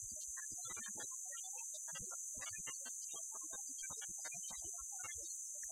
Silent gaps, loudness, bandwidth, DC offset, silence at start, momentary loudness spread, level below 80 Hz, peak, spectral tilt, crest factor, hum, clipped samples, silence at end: none; -45 LUFS; 16 kHz; under 0.1%; 0 s; 1 LU; -74 dBFS; -32 dBFS; 0.5 dB/octave; 16 dB; none; under 0.1%; 0 s